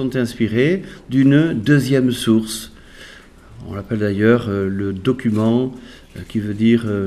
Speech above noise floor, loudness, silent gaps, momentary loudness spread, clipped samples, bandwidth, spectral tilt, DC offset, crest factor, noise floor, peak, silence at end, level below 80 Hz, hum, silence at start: 25 dB; -18 LUFS; none; 16 LU; under 0.1%; 14 kHz; -6.5 dB/octave; under 0.1%; 18 dB; -42 dBFS; 0 dBFS; 0 s; -46 dBFS; none; 0 s